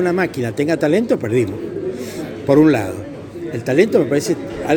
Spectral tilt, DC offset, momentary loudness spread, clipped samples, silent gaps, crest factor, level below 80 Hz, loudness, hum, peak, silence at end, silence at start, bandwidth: -6.5 dB/octave; under 0.1%; 14 LU; under 0.1%; none; 18 dB; -50 dBFS; -18 LUFS; none; 0 dBFS; 0 s; 0 s; 20 kHz